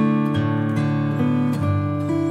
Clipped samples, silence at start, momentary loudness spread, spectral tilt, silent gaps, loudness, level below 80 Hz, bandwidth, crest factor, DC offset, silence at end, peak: under 0.1%; 0 s; 2 LU; -8.5 dB/octave; none; -21 LUFS; -58 dBFS; 12 kHz; 12 dB; under 0.1%; 0 s; -8 dBFS